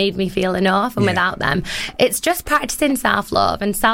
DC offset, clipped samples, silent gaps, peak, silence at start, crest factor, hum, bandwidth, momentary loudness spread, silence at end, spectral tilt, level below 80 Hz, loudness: under 0.1%; under 0.1%; none; -2 dBFS; 0 s; 16 dB; none; 17 kHz; 3 LU; 0 s; -4 dB/octave; -40 dBFS; -18 LUFS